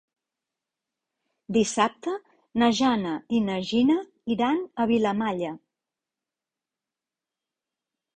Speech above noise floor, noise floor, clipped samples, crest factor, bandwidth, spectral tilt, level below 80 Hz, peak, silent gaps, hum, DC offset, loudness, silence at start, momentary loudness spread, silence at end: 65 dB; -89 dBFS; under 0.1%; 18 dB; 9.6 kHz; -5 dB/octave; -64 dBFS; -8 dBFS; none; none; under 0.1%; -25 LUFS; 1.5 s; 11 LU; 2.6 s